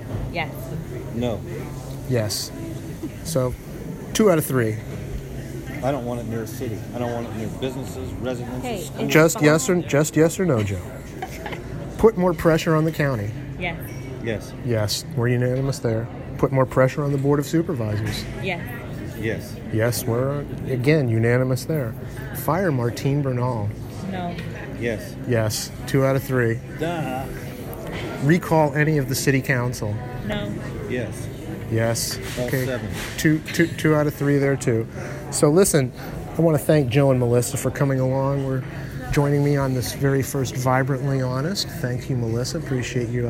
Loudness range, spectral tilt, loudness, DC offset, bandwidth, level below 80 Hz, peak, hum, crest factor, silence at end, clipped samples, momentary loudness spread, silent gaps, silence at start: 5 LU; -5.5 dB/octave; -23 LUFS; under 0.1%; 16.5 kHz; -42 dBFS; -2 dBFS; none; 20 dB; 0 s; under 0.1%; 14 LU; none; 0 s